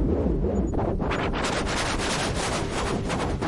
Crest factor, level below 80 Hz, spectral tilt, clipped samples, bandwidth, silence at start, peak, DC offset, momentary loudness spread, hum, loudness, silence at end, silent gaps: 14 dB; -32 dBFS; -5 dB/octave; under 0.1%; 11.5 kHz; 0 s; -12 dBFS; under 0.1%; 2 LU; none; -26 LUFS; 0 s; none